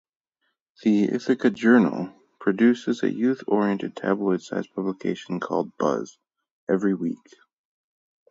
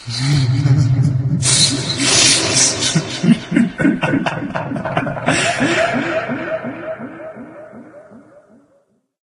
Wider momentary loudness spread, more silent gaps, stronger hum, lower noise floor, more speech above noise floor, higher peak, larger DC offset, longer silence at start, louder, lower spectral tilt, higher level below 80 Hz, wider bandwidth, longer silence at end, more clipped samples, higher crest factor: second, 11 LU vs 16 LU; first, 6.51-6.67 s vs none; neither; first, -76 dBFS vs -59 dBFS; first, 54 dB vs 42 dB; second, -4 dBFS vs 0 dBFS; neither; first, 0.85 s vs 0 s; second, -24 LUFS vs -15 LUFS; first, -7 dB/octave vs -3.5 dB/octave; second, -72 dBFS vs -46 dBFS; second, 7.8 kHz vs 11.5 kHz; about the same, 1.15 s vs 1.05 s; neither; about the same, 20 dB vs 18 dB